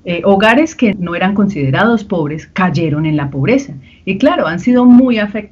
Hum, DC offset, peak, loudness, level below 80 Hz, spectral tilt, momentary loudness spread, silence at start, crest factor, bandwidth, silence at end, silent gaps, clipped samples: none; under 0.1%; 0 dBFS; -12 LUFS; -44 dBFS; -7 dB/octave; 10 LU; 0.05 s; 12 dB; 7.4 kHz; 0.05 s; none; 0.1%